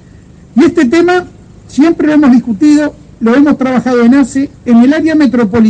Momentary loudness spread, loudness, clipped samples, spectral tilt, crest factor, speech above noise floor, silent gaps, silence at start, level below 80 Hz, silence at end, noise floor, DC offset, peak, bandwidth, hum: 7 LU; -9 LUFS; under 0.1%; -6 dB/octave; 8 dB; 28 dB; none; 0.55 s; -42 dBFS; 0 s; -36 dBFS; under 0.1%; 0 dBFS; 9.2 kHz; none